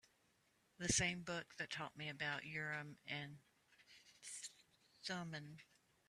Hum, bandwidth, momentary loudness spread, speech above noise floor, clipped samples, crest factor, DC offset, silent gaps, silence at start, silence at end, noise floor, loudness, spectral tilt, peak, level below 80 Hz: none; 14 kHz; 22 LU; 33 dB; under 0.1%; 26 dB; under 0.1%; none; 0.8 s; 0.45 s; -79 dBFS; -45 LUFS; -2.5 dB/octave; -24 dBFS; -70 dBFS